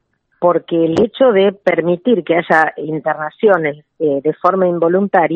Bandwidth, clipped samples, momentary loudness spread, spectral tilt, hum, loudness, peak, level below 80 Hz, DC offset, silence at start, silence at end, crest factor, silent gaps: 8 kHz; under 0.1%; 7 LU; -7.5 dB/octave; none; -15 LUFS; 0 dBFS; -58 dBFS; under 0.1%; 0.4 s; 0 s; 14 dB; none